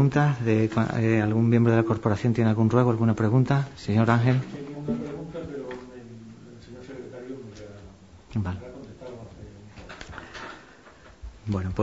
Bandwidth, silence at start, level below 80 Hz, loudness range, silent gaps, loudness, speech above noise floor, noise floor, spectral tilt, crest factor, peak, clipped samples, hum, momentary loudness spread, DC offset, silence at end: 7.8 kHz; 0 s; -52 dBFS; 16 LU; none; -24 LUFS; 28 dB; -50 dBFS; -8.5 dB/octave; 20 dB; -6 dBFS; under 0.1%; none; 23 LU; under 0.1%; 0 s